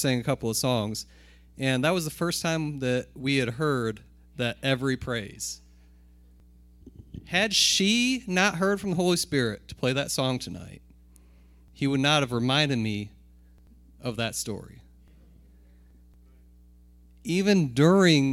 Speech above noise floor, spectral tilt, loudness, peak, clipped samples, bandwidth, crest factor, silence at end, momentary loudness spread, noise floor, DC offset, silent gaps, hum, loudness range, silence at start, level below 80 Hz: 29 dB; -4.5 dB/octave; -26 LUFS; -8 dBFS; under 0.1%; 16.5 kHz; 20 dB; 0 s; 16 LU; -54 dBFS; under 0.1%; none; 60 Hz at -50 dBFS; 12 LU; 0 s; -54 dBFS